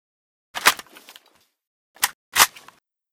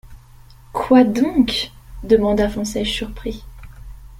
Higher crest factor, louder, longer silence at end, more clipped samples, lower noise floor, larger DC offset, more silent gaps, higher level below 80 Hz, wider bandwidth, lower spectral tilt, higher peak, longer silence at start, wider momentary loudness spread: first, 26 dB vs 18 dB; about the same, -20 LUFS vs -18 LUFS; first, 0.65 s vs 0 s; neither; first, -61 dBFS vs -44 dBFS; neither; first, 1.67-1.94 s, 2.14-2.32 s vs none; second, -62 dBFS vs -36 dBFS; first, over 20 kHz vs 15.5 kHz; second, 1.5 dB/octave vs -5 dB/octave; about the same, 0 dBFS vs -2 dBFS; first, 0.55 s vs 0.05 s; second, 13 LU vs 16 LU